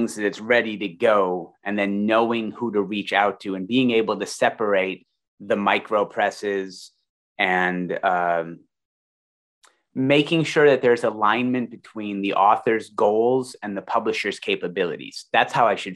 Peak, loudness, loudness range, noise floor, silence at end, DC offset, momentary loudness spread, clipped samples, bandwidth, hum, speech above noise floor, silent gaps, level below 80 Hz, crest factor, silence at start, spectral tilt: -2 dBFS; -22 LUFS; 4 LU; under -90 dBFS; 0 s; under 0.1%; 10 LU; under 0.1%; 12 kHz; none; over 68 dB; 5.28-5.38 s, 7.09-7.36 s, 8.85-9.62 s; -72 dBFS; 20 dB; 0 s; -5 dB/octave